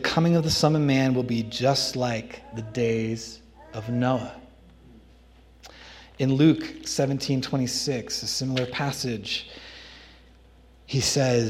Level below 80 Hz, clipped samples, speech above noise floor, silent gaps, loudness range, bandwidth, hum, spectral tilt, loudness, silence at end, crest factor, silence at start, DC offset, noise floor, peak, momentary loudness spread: -54 dBFS; under 0.1%; 29 dB; none; 6 LU; 15.5 kHz; none; -5 dB/octave; -25 LUFS; 0 s; 20 dB; 0 s; under 0.1%; -53 dBFS; -6 dBFS; 20 LU